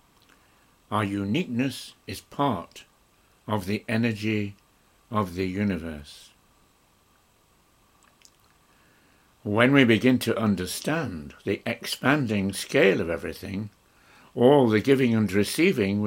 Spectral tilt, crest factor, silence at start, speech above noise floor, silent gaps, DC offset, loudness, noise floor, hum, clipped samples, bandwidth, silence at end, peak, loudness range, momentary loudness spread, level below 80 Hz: -5.5 dB/octave; 22 dB; 0.9 s; 38 dB; none; under 0.1%; -24 LUFS; -62 dBFS; none; under 0.1%; 16.5 kHz; 0 s; -4 dBFS; 10 LU; 17 LU; -58 dBFS